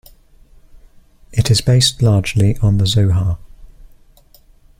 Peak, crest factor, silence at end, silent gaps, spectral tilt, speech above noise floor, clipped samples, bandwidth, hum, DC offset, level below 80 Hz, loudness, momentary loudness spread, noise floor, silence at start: -2 dBFS; 16 dB; 1.15 s; none; -5 dB/octave; 34 dB; under 0.1%; 15.5 kHz; none; under 0.1%; -34 dBFS; -15 LUFS; 9 LU; -48 dBFS; 1.3 s